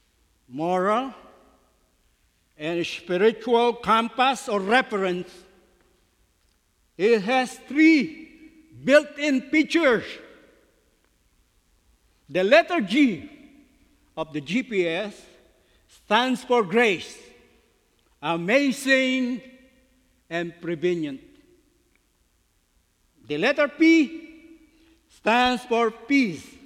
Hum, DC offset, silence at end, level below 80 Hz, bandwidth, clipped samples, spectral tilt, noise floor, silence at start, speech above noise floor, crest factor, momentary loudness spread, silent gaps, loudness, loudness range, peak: none; under 0.1%; 0.25 s; -64 dBFS; 14 kHz; under 0.1%; -4.5 dB/octave; -66 dBFS; 0.5 s; 44 dB; 22 dB; 15 LU; none; -22 LUFS; 6 LU; -4 dBFS